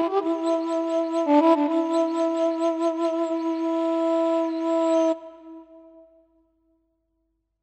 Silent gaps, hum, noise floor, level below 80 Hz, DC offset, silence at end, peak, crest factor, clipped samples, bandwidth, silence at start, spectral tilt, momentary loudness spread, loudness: none; none; -74 dBFS; -76 dBFS; under 0.1%; 1.85 s; -8 dBFS; 16 dB; under 0.1%; 8.6 kHz; 0 s; -3.5 dB/octave; 6 LU; -23 LUFS